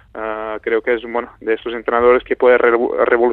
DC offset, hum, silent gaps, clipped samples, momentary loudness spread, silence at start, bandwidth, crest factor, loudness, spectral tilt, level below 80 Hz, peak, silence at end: under 0.1%; none; none; under 0.1%; 11 LU; 0.15 s; 4.2 kHz; 16 dB; -16 LUFS; -7.5 dB/octave; -48 dBFS; 0 dBFS; 0 s